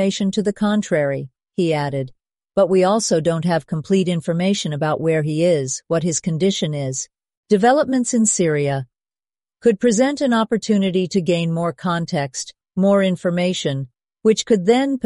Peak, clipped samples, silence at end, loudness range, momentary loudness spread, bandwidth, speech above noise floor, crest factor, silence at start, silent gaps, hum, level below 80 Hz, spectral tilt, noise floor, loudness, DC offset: -2 dBFS; under 0.1%; 0.05 s; 1 LU; 9 LU; 11.5 kHz; over 72 dB; 16 dB; 0 s; 7.37-7.43 s; none; -58 dBFS; -5 dB/octave; under -90 dBFS; -19 LUFS; under 0.1%